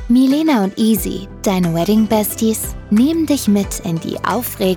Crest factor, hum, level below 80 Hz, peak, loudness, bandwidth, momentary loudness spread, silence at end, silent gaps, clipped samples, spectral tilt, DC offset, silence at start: 12 dB; none; -36 dBFS; -4 dBFS; -16 LUFS; over 20 kHz; 8 LU; 0 s; none; under 0.1%; -5.5 dB/octave; under 0.1%; 0 s